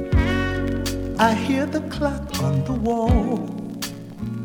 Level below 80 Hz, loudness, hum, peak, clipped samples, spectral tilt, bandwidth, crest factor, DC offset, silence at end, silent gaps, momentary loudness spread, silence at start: -30 dBFS; -23 LUFS; none; -4 dBFS; under 0.1%; -6 dB/octave; over 20 kHz; 18 dB; under 0.1%; 0 s; none; 11 LU; 0 s